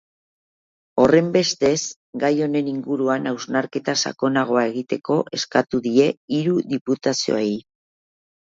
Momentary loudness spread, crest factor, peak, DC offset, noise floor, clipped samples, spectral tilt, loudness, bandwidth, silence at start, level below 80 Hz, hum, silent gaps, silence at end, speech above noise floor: 7 LU; 20 dB; -2 dBFS; under 0.1%; under -90 dBFS; under 0.1%; -4.5 dB/octave; -21 LUFS; 7.8 kHz; 0.95 s; -60 dBFS; none; 1.96-2.13 s, 6.17-6.28 s, 6.81-6.85 s; 0.95 s; over 70 dB